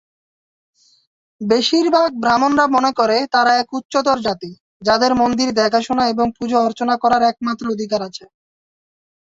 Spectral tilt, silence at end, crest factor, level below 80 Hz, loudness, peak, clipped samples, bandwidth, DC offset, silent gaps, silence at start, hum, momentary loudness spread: -4 dB/octave; 1.05 s; 16 dB; -54 dBFS; -16 LUFS; -2 dBFS; under 0.1%; 8 kHz; under 0.1%; 3.85-3.89 s, 4.60-4.80 s; 1.4 s; none; 9 LU